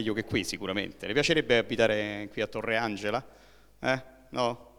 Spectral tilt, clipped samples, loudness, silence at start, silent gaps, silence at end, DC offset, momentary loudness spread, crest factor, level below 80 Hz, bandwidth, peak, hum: -4.5 dB/octave; under 0.1%; -29 LUFS; 0 s; none; 0.1 s; under 0.1%; 9 LU; 20 dB; -56 dBFS; 17.5 kHz; -10 dBFS; none